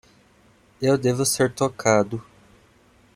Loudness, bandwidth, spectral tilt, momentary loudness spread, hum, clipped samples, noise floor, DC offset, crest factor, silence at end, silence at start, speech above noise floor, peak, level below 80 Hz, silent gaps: -22 LUFS; 16 kHz; -4.5 dB/octave; 7 LU; none; under 0.1%; -57 dBFS; under 0.1%; 20 dB; 0.95 s; 0.8 s; 36 dB; -4 dBFS; -58 dBFS; none